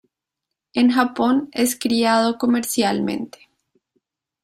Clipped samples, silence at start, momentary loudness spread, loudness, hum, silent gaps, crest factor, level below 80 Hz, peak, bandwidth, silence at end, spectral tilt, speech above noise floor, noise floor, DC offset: under 0.1%; 0.75 s; 9 LU; -19 LUFS; none; none; 18 dB; -62 dBFS; -2 dBFS; 16 kHz; 1.15 s; -3.5 dB/octave; 64 dB; -83 dBFS; under 0.1%